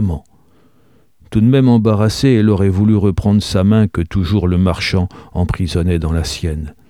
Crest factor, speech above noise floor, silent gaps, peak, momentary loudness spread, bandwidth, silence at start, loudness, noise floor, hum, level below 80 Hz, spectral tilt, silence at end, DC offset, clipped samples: 14 dB; 41 dB; none; 0 dBFS; 9 LU; 13.5 kHz; 0 s; -15 LUFS; -54 dBFS; none; -30 dBFS; -7 dB/octave; 0.2 s; 0.3%; under 0.1%